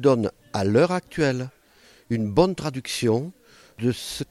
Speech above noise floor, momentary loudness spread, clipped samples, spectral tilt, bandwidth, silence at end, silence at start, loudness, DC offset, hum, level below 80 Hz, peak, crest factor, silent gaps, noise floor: 33 dB; 9 LU; under 0.1%; -6 dB/octave; 15.5 kHz; 0.05 s; 0 s; -24 LUFS; under 0.1%; none; -52 dBFS; -6 dBFS; 18 dB; none; -55 dBFS